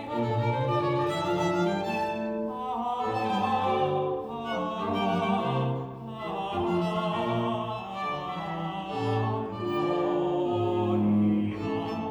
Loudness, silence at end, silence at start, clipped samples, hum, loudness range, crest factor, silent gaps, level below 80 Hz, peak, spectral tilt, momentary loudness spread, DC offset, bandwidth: -29 LUFS; 0 s; 0 s; under 0.1%; none; 3 LU; 14 dB; none; -60 dBFS; -14 dBFS; -7.5 dB/octave; 7 LU; under 0.1%; over 20 kHz